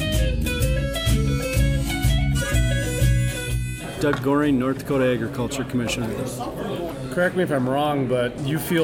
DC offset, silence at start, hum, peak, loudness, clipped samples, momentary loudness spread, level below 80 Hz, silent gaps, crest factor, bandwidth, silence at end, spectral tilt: under 0.1%; 0 s; none; -8 dBFS; -23 LUFS; under 0.1%; 7 LU; -28 dBFS; none; 14 dB; 16.5 kHz; 0 s; -5.5 dB/octave